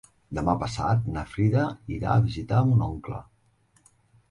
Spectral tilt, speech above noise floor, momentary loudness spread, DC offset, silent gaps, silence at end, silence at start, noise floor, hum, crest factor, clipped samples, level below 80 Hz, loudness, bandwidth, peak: -8 dB/octave; 40 dB; 13 LU; under 0.1%; none; 1.1 s; 0.3 s; -64 dBFS; none; 18 dB; under 0.1%; -44 dBFS; -26 LUFS; 10.5 kHz; -8 dBFS